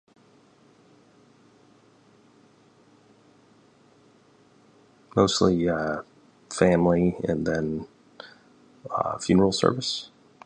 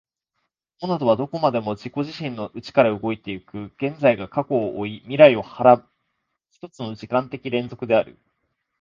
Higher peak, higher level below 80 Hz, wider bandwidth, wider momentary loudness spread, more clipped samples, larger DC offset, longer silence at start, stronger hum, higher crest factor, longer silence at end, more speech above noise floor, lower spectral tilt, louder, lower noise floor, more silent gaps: second, -4 dBFS vs 0 dBFS; first, -52 dBFS vs -60 dBFS; first, 10.5 kHz vs 7.2 kHz; first, 25 LU vs 18 LU; neither; neither; first, 5.15 s vs 0.8 s; neither; about the same, 24 dB vs 22 dB; second, 0.4 s vs 0.7 s; second, 35 dB vs 56 dB; second, -5.5 dB/octave vs -7.5 dB/octave; second, -24 LUFS vs -21 LUFS; second, -58 dBFS vs -77 dBFS; neither